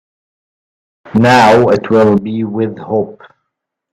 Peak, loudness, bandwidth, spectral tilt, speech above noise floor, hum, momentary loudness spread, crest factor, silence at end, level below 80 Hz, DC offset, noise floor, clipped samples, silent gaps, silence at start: 0 dBFS; -11 LUFS; 13.5 kHz; -6.5 dB/octave; 65 dB; none; 11 LU; 14 dB; 0.8 s; -48 dBFS; under 0.1%; -75 dBFS; under 0.1%; none; 1.05 s